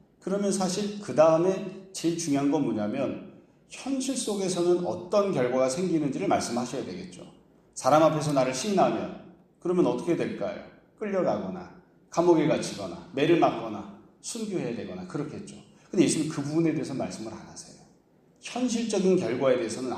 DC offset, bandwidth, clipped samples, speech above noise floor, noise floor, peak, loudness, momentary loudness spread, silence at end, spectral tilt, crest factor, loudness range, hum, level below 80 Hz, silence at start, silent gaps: under 0.1%; 13.5 kHz; under 0.1%; 35 dB; -61 dBFS; -6 dBFS; -27 LUFS; 17 LU; 0 s; -5.5 dB/octave; 20 dB; 4 LU; none; -66 dBFS; 0.25 s; none